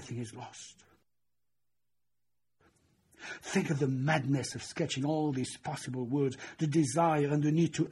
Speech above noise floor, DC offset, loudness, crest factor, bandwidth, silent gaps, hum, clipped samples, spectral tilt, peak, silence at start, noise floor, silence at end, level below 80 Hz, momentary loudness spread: 58 dB; under 0.1%; -32 LUFS; 18 dB; 12 kHz; none; 60 Hz at -65 dBFS; under 0.1%; -6 dB/octave; -16 dBFS; 0 s; -90 dBFS; 0 s; -70 dBFS; 17 LU